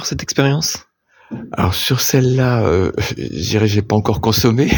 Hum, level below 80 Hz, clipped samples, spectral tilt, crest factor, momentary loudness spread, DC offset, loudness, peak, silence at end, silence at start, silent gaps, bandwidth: none; -38 dBFS; under 0.1%; -5 dB/octave; 16 dB; 9 LU; under 0.1%; -16 LUFS; 0 dBFS; 0 s; 0 s; none; 19.5 kHz